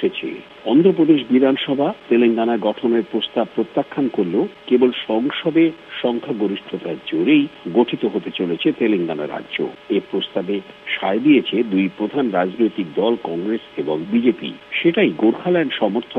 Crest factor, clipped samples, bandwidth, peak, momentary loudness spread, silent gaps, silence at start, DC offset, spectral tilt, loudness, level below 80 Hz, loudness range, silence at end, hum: 16 dB; under 0.1%; 4.6 kHz; -2 dBFS; 9 LU; none; 0 s; under 0.1%; -8 dB/octave; -19 LUFS; -64 dBFS; 3 LU; 0 s; none